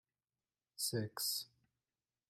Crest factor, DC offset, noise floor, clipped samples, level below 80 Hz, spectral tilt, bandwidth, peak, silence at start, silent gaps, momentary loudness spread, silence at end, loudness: 20 dB; under 0.1%; under -90 dBFS; under 0.1%; -84 dBFS; -3 dB/octave; 16 kHz; -26 dBFS; 0.8 s; none; 16 LU; 0.85 s; -40 LUFS